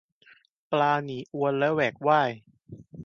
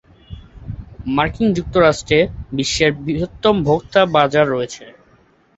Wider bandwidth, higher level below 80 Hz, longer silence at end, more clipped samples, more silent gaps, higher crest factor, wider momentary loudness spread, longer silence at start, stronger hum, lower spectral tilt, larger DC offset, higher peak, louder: second, 7 kHz vs 8.2 kHz; second, -68 dBFS vs -38 dBFS; second, 0 s vs 0.65 s; neither; neither; about the same, 20 dB vs 18 dB; second, 12 LU vs 18 LU; first, 0.7 s vs 0.3 s; neither; first, -7 dB/octave vs -5 dB/octave; neither; second, -8 dBFS vs 0 dBFS; second, -26 LUFS vs -17 LUFS